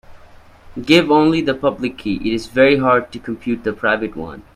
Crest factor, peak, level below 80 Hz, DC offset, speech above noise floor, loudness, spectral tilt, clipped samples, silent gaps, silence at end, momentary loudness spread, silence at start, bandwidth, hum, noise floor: 18 dB; 0 dBFS; -44 dBFS; under 0.1%; 26 dB; -16 LUFS; -6 dB/octave; under 0.1%; none; 0.15 s; 15 LU; 0.1 s; 13 kHz; none; -43 dBFS